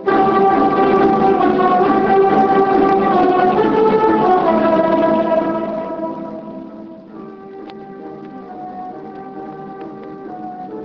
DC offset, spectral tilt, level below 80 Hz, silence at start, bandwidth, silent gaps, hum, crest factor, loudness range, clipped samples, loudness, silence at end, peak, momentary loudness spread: under 0.1%; -8.5 dB/octave; -48 dBFS; 0 s; 6.2 kHz; none; none; 14 dB; 18 LU; under 0.1%; -14 LUFS; 0 s; -2 dBFS; 20 LU